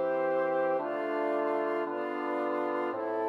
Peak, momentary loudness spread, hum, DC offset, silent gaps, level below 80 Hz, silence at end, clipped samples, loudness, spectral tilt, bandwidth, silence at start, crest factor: -18 dBFS; 4 LU; none; under 0.1%; none; under -90 dBFS; 0 s; under 0.1%; -31 LUFS; -7 dB/octave; 5.8 kHz; 0 s; 12 dB